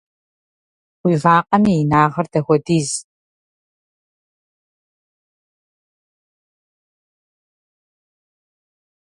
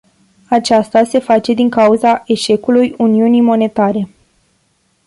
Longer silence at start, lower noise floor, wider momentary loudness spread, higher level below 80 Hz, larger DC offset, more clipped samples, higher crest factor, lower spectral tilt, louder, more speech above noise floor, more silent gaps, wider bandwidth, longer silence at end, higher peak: first, 1.05 s vs 0.5 s; first, under -90 dBFS vs -59 dBFS; first, 9 LU vs 5 LU; about the same, -56 dBFS vs -54 dBFS; neither; neither; first, 22 dB vs 12 dB; about the same, -6 dB/octave vs -5.5 dB/octave; second, -16 LUFS vs -12 LUFS; first, over 75 dB vs 48 dB; neither; about the same, 11.5 kHz vs 11.5 kHz; first, 6.1 s vs 1 s; about the same, 0 dBFS vs -2 dBFS